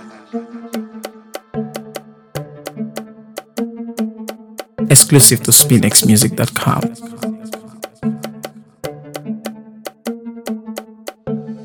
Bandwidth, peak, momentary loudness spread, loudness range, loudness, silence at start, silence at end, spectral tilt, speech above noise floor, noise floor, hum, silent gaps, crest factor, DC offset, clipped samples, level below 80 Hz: over 20 kHz; 0 dBFS; 25 LU; 18 LU; -12 LUFS; 0 s; 0 s; -3.5 dB/octave; 23 dB; -34 dBFS; none; none; 18 dB; under 0.1%; 0.3%; -52 dBFS